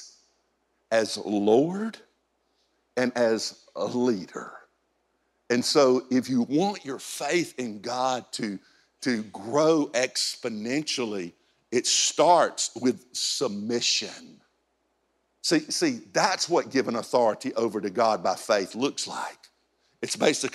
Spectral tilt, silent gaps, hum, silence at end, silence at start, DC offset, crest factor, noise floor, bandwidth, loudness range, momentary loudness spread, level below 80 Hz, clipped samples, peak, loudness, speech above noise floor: -3 dB/octave; none; none; 0.05 s; 0 s; under 0.1%; 20 dB; -73 dBFS; 14 kHz; 4 LU; 12 LU; -78 dBFS; under 0.1%; -6 dBFS; -26 LUFS; 47 dB